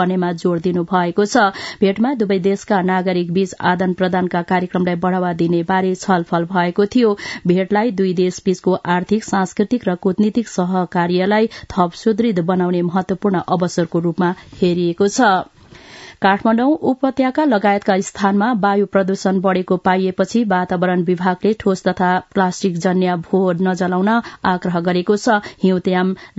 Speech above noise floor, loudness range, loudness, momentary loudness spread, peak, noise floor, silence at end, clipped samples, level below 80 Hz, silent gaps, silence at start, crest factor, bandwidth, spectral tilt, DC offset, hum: 23 dB; 2 LU; -17 LUFS; 4 LU; 0 dBFS; -40 dBFS; 0.1 s; under 0.1%; -54 dBFS; none; 0 s; 16 dB; 8 kHz; -6.5 dB/octave; under 0.1%; none